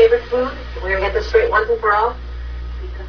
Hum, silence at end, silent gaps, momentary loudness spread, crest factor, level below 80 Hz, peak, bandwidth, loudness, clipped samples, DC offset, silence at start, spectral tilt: none; 0 s; none; 15 LU; 16 dB; -28 dBFS; -2 dBFS; 5.4 kHz; -18 LUFS; under 0.1%; under 0.1%; 0 s; -6 dB/octave